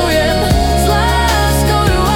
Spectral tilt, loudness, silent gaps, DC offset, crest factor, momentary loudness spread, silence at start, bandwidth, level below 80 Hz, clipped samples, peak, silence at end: -5 dB/octave; -12 LUFS; none; under 0.1%; 10 dB; 1 LU; 0 s; 18 kHz; -18 dBFS; under 0.1%; -2 dBFS; 0 s